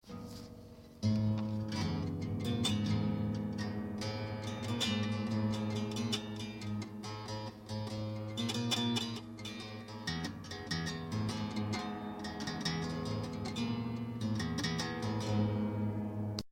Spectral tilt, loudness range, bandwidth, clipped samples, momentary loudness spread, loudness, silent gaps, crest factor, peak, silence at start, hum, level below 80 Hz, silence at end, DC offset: -5.5 dB/octave; 3 LU; 16.5 kHz; under 0.1%; 10 LU; -37 LUFS; none; 20 dB; -16 dBFS; 0.05 s; none; -60 dBFS; 0 s; under 0.1%